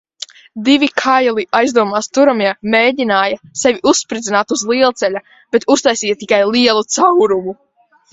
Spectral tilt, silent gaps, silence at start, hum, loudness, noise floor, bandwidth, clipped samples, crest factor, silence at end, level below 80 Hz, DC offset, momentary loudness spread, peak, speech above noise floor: -2.5 dB/octave; none; 0.55 s; none; -13 LUFS; -34 dBFS; 8.2 kHz; under 0.1%; 14 dB; 0.6 s; -56 dBFS; under 0.1%; 7 LU; 0 dBFS; 21 dB